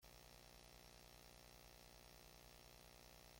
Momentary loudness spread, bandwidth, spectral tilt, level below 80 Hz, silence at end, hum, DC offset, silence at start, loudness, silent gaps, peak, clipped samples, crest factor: 0 LU; 16.5 kHz; -3 dB/octave; -72 dBFS; 0 s; 60 Hz at -75 dBFS; under 0.1%; 0 s; -63 LUFS; none; -48 dBFS; under 0.1%; 18 dB